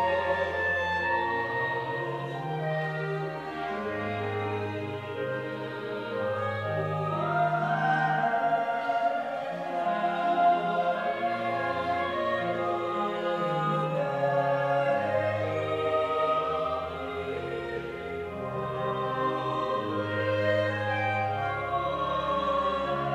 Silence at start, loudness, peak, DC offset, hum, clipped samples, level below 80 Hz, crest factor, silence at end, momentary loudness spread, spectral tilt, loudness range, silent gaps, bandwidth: 0 s; -29 LUFS; -14 dBFS; under 0.1%; none; under 0.1%; -60 dBFS; 16 dB; 0 s; 7 LU; -7 dB/octave; 5 LU; none; 12.5 kHz